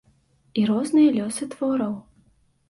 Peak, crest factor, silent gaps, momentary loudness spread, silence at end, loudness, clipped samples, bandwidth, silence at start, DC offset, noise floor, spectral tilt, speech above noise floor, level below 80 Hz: -8 dBFS; 16 dB; none; 12 LU; 0.7 s; -23 LUFS; under 0.1%; 11.5 kHz; 0.55 s; under 0.1%; -62 dBFS; -5.5 dB/octave; 40 dB; -64 dBFS